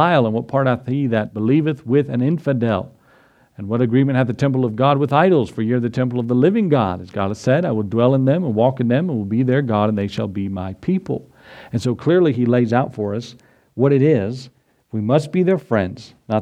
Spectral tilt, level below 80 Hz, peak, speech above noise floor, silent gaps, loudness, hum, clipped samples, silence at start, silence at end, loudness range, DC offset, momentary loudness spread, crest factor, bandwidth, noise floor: -8.5 dB/octave; -58 dBFS; 0 dBFS; 36 dB; none; -18 LUFS; none; under 0.1%; 0 s; 0 s; 3 LU; under 0.1%; 10 LU; 18 dB; 9.4 kHz; -53 dBFS